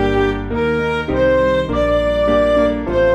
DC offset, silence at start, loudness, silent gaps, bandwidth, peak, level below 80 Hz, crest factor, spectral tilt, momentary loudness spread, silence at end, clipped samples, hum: under 0.1%; 0 s; -16 LUFS; none; 9.8 kHz; -4 dBFS; -28 dBFS; 12 dB; -7 dB/octave; 5 LU; 0 s; under 0.1%; none